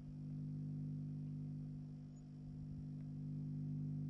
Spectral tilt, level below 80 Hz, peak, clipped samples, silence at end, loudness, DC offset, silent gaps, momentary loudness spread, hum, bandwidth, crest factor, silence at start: -10.5 dB/octave; -66 dBFS; -38 dBFS; under 0.1%; 0 s; -48 LUFS; under 0.1%; none; 8 LU; 50 Hz at -50 dBFS; 5.8 kHz; 10 dB; 0 s